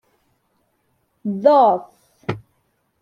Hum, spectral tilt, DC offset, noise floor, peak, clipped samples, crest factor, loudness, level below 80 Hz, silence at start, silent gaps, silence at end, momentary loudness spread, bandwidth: none; -8 dB/octave; under 0.1%; -67 dBFS; -2 dBFS; under 0.1%; 20 dB; -18 LUFS; -64 dBFS; 1.25 s; none; 0.65 s; 19 LU; 6.4 kHz